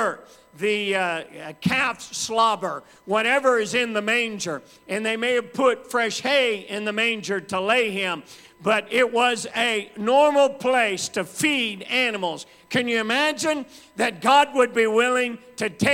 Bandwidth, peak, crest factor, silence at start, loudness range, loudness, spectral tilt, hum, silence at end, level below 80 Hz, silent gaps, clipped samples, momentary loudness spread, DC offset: 16.5 kHz; -6 dBFS; 18 dB; 0 s; 2 LU; -22 LUFS; -3 dB/octave; none; 0 s; -64 dBFS; none; under 0.1%; 10 LU; under 0.1%